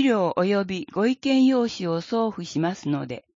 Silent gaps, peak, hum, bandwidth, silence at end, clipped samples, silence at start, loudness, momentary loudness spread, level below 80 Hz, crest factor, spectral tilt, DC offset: none; -10 dBFS; none; 7.6 kHz; 0.2 s; under 0.1%; 0 s; -24 LUFS; 9 LU; -66 dBFS; 14 dB; -6 dB/octave; under 0.1%